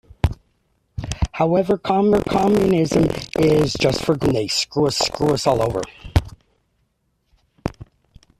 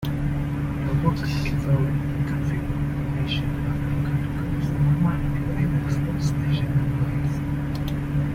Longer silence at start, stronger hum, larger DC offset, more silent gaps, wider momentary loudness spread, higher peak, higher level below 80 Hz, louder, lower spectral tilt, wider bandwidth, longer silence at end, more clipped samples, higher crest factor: first, 0.25 s vs 0 s; neither; neither; neither; first, 14 LU vs 4 LU; first, -2 dBFS vs -8 dBFS; about the same, -36 dBFS vs -34 dBFS; first, -19 LUFS vs -24 LUFS; second, -5.5 dB/octave vs -7.5 dB/octave; about the same, 14 kHz vs 15 kHz; first, 0.55 s vs 0 s; neither; about the same, 18 dB vs 16 dB